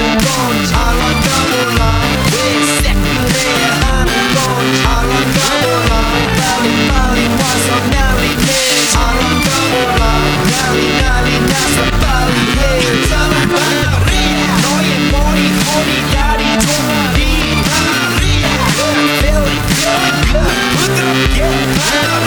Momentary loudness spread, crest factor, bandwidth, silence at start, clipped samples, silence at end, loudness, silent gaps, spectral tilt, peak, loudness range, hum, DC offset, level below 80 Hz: 1 LU; 12 dB; over 20 kHz; 0 s; under 0.1%; 0 s; -12 LUFS; none; -4 dB/octave; 0 dBFS; 1 LU; none; 0.5%; -18 dBFS